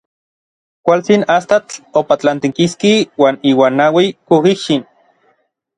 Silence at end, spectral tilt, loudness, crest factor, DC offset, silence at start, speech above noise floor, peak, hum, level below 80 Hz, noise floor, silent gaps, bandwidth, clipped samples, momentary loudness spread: 0.95 s; -5.5 dB/octave; -13 LUFS; 14 dB; under 0.1%; 0.85 s; 48 dB; 0 dBFS; none; -58 dBFS; -60 dBFS; none; 11 kHz; under 0.1%; 6 LU